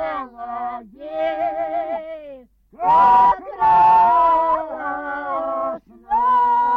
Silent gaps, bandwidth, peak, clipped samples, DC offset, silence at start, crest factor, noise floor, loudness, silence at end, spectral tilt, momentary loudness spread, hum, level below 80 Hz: none; 5.6 kHz; -6 dBFS; under 0.1%; under 0.1%; 0 s; 12 dB; -43 dBFS; -18 LUFS; 0 s; -6 dB/octave; 17 LU; none; -50 dBFS